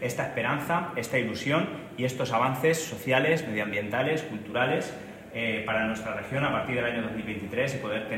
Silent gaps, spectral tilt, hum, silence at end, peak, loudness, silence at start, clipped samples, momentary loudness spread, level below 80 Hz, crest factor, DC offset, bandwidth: none; -5 dB/octave; none; 0 s; -8 dBFS; -28 LUFS; 0 s; under 0.1%; 7 LU; -60 dBFS; 20 dB; under 0.1%; 16 kHz